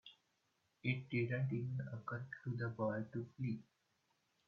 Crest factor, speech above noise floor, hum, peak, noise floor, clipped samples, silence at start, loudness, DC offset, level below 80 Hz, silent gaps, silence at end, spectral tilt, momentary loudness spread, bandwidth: 18 dB; 40 dB; none; -24 dBFS; -82 dBFS; under 0.1%; 0.05 s; -43 LUFS; under 0.1%; -78 dBFS; none; 0.85 s; -7 dB/octave; 7 LU; 5.2 kHz